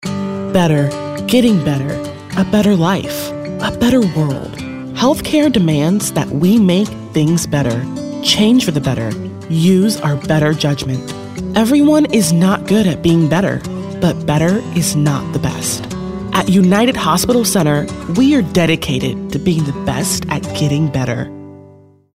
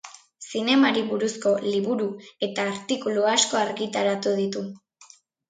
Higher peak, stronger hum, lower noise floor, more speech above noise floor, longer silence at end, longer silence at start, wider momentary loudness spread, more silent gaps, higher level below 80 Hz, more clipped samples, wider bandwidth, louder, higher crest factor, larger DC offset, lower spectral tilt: first, 0 dBFS vs -6 dBFS; neither; second, -43 dBFS vs -54 dBFS; about the same, 30 dB vs 30 dB; about the same, 0.5 s vs 0.45 s; about the same, 0 s vs 0.05 s; about the same, 10 LU vs 12 LU; neither; first, -40 dBFS vs -74 dBFS; neither; first, 16 kHz vs 9.6 kHz; first, -15 LUFS vs -24 LUFS; second, 14 dB vs 20 dB; neither; first, -5.5 dB/octave vs -3 dB/octave